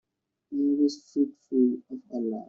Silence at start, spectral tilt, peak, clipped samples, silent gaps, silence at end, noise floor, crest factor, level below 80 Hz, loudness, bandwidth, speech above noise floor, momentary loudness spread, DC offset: 0.5 s; -7 dB/octave; -12 dBFS; under 0.1%; none; 0.05 s; -54 dBFS; 16 dB; -76 dBFS; -28 LUFS; 7.6 kHz; 26 dB; 11 LU; under 0.1%